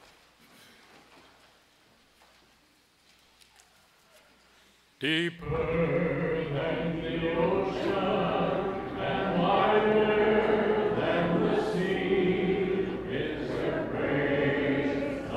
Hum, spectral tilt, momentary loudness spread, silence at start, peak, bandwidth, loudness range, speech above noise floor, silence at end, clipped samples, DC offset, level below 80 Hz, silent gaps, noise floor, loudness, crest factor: none; -7 dB/octave; 8 LU; 5 s; -12 dBFS; 11.5 kHz; 7 LU; 36 dB; 0 s; under 0.1%; under 0.1%; -52 dBFS; none; -64 dBFS; -28 LUFS; 16 dB